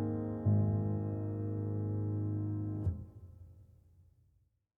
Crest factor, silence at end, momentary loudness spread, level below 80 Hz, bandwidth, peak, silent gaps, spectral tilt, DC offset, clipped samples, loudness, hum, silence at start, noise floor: 16 dB; 1.15 s; 19 LU; -56 dBFS; 2 kHz; -20 dBFS; none; -13 dB/octave; under 0.1%; under 0.1%; -36 LUFS; none; 0 s; -74 dBFS